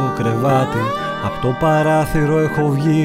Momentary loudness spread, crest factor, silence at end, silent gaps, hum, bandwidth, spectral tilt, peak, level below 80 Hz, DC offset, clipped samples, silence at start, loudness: 6 LU; 12 dB; 0 s; none; none; 15.5 kHz; -7 dB/octave; -4 dBFS; -36 dBFS; under 0.1%; under 0.1%; 0 s; -17 LUFS